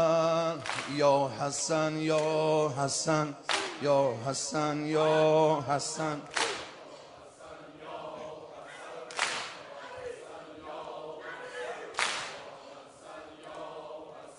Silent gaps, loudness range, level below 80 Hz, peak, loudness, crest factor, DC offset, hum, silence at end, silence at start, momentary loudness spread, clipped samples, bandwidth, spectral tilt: none; 11 LU; -72 dBFS; -10 dBFS; -30 LUFS; 20 dB; under 0.1%; none; 0 s; 0 s; 21 LU; under 0.1%; 10.5 kHz; -4 dB/octave